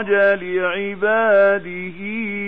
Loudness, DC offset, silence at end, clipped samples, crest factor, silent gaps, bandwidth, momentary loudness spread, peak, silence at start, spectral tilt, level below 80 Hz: -18 LUFS; 0.9%; 0 s; under 0.1%; 14 dB; none; 4.2 kHz; 13 LU; -4 dBFS; 0 s; -8 dB/octave; -60 dBFS